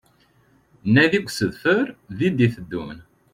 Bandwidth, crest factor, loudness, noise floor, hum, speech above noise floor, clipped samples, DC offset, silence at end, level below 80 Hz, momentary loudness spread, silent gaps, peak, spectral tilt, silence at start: 15.5 kHz; 18 dB; -21 LUFS; -59 dBFS; none; 38 dB; under 0.1%; under 0.1%; 0.3 s; -54 dBFS; 15 LU; none; -4 dBFS; -6 dB/octave; 0.85 s